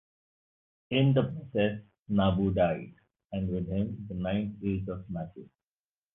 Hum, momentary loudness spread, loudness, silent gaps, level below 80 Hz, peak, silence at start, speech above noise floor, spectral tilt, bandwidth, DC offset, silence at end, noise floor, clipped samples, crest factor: none; 13 LU; -30 LUFS; 1.99-2.05 s; -50 dBFS; -12 dBFS; 0.9 s; over 61 dB; -11 dB/octave; 3.9 kHz; under 0.1%; 0.7 s; under -90 dBFS; under 0.1%; 18 dB